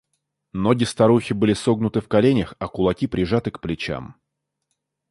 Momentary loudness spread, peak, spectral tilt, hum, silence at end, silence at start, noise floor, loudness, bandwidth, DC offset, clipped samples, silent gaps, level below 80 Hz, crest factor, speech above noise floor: 11 LU; -4 dBFS; -6.5 dB/octave; none; 1 s; 0.55 s; -80 dBFS; -21 LUFS; 11.5 kHz; under 0.1%; under 0.1%; none; -46 dBFS; 18 dB; 59 dB